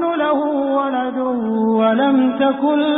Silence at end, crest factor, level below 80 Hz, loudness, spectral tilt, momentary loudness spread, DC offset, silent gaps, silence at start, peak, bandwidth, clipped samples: 0 s; 12 dB; -60 dBFS; -17 LUFS; -11 dB/octave; 5 LU; under 0.1%; none; 0 s; -4 dBFS; 4 kHz; under 0.1%